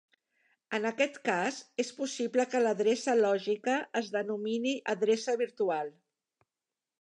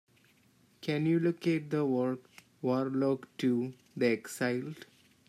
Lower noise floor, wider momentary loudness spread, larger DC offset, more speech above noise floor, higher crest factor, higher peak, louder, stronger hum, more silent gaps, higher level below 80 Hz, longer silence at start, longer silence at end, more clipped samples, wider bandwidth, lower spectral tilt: first, under -90 dBFS vs -66 dBFS; second, 7 LU vs 11 LU; neither; first, over 60 dB vs 35 dB; about the same, 18 dB vs 18 dB; about the same, -14 dBFS vs -16 dBFS; about the same, -31 LUFS vs -32 LUFS; neither; neither; second, -88 dBFS vs -80 dBFS; about the same, 0.7 s vs 0.8 s; first, 1.1 s vs 0.45 s; neither; second, 10.5 kHz vs 14.5 kHz; second, -3.5 dB/octave vs -6.5 dB/octave